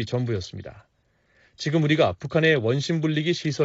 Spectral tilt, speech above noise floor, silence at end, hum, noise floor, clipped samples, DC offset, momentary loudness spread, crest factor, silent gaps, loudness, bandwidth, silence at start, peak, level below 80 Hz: -5 dB/octave; 41 dB; 0 s; none; -65 dBFS; under 0.1%; under 0.1%; 14 LU; 18 dB; none; -23 LUFS; 8 kHz; 0 s; -6 dBFS; -58 dBFS